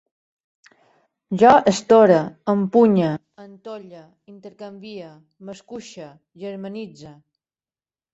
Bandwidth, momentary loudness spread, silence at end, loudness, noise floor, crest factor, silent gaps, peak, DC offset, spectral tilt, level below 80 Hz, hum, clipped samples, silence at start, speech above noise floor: 8 kHz; 25 LU; 1.05 s; -16 LUFS; under -90 dBFS; 20 dB; none; -2 dBFS; under 0.1%; -6.5 dB/octave; -62 dBFS; none; under 0.1%; 1.3 s; over 70 dB